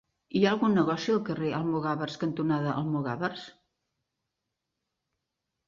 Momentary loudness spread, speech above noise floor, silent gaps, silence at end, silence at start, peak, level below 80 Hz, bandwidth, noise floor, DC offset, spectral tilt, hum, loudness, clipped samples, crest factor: 8 LU; 57 dB; none; 2.15 s; 0.3 s; -10 dBFS; -68 dBFS; 7.4 kHz; -85 dBFS; under 0.1%; -7 dB/octave; none; -29 LUFS; under 0.1%; 20 dB